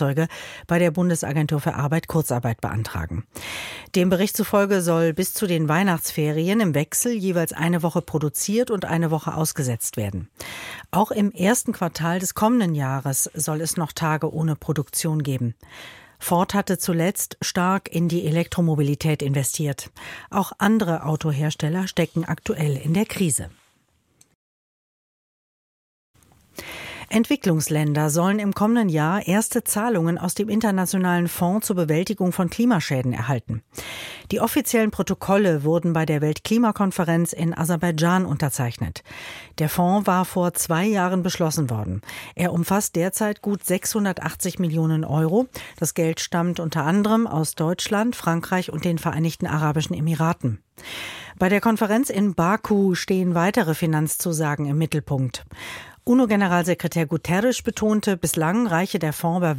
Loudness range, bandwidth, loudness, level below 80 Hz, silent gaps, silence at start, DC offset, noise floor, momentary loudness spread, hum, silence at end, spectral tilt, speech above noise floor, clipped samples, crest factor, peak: 3 LU; 17 kHz; -22 LUFS; -52 dBFS; 24.35-26.14 s; 0 s; under 0.1%; -65 dBFS; 10 LU; none; 0 s; -5.5 dB/octave; 43 dB; under 0.1%; 18 dB; -4 dBFS